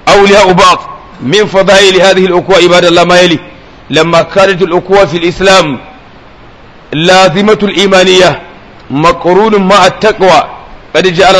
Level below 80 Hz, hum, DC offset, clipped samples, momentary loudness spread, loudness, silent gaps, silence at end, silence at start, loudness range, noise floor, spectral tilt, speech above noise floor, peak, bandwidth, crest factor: -34 dBFS; none; 0.8%; 7%; 9 LU; -5 LUFS; none; 0 s; 0.05 s; 3 LU; -33 dBFS; -4 dB/octave; 28 dB; 0 dBFS; 11 kHz; 6 dB